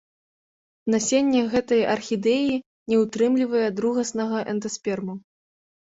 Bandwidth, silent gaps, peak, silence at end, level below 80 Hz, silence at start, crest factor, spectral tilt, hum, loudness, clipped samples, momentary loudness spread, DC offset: 8 kHz; 2.66-2.86 s; -8 dBFS; 0.8 s; -62 dBFS; 0.85 s; 16 dB; -4.5 dB/octave; none; -23 LUFS; under 0.1%; 9 LU; under 0.1%